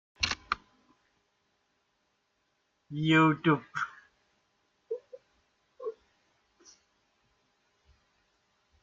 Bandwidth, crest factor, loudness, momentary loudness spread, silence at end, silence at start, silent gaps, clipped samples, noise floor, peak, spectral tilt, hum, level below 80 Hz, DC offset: 7.6 kHz; 24 dB; -29 LUFS; 19 LU; 2.9 s; 0.2 s; none; under 0.1%; -77 dBFS; -12 dBFS; -5.5 dB/octave; none; -64 dBFS; under 0.1%